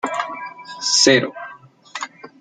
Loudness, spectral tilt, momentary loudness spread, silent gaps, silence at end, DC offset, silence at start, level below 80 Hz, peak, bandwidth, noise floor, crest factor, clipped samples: -17 LUFS; -2 dB/octave; 22 LU; none; 0.15 s; under 0.1%; 0.05 s; -68 dBFS; -2 dBFS; 11 kHz; -42 dBFS; 20 dB; under 0.1%